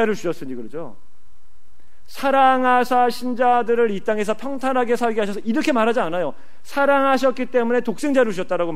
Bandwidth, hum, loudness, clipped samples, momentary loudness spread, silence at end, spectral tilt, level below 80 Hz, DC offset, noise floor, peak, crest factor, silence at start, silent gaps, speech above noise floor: 15.5 kHz; none; -19 LUFS; under 0.1%; 12 LU; 0 s; -5 dB/octave; -58 dBFS; 4%; -56 dBFS; -4 dBFS; 16 dB; 0 s; none; 37 dB